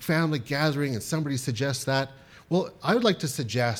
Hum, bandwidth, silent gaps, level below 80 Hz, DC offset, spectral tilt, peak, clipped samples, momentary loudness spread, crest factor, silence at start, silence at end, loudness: none; 18 kHz; none; -62 dBFS; under 0.1%; -5 dB/octave; -8 dBFS; under 0.1%; 6 LU; 18 dB; 0 s; 0 s; -27 LUFS